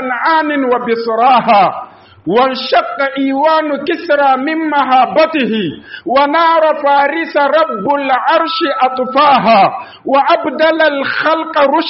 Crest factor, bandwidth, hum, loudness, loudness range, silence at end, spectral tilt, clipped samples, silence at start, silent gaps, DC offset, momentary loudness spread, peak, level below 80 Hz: 12 dB; 5.8 kHz; none; -12 LUFS; 1 LU; 0 s; -1.5 dB/octave; under 0.1%; 0 s; none; under 0.1%; 6 LU; 0 dBFS; -58 dBFS